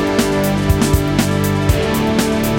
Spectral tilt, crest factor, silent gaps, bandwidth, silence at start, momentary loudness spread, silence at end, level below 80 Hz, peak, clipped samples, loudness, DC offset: -5.5 dB/octave; 14 dB; none; 17 kHz; 0 s; 1 LU; 0 s; -26 dBFS; -2 dBFS; under 0.1%; -16 LUFS; under 0.1%